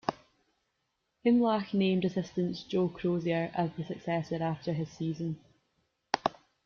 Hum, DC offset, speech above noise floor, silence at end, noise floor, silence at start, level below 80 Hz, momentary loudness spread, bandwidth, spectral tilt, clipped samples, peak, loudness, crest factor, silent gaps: none; under 0.1%; 50 dB; 0.35 s; -80 dBFS; 0.05 s; -68 dBFS; 9 LU; 7 kHz; -7.5 dB/octave; under 0.1%; -8 dBFS; -32 LUFS; 24 dB; none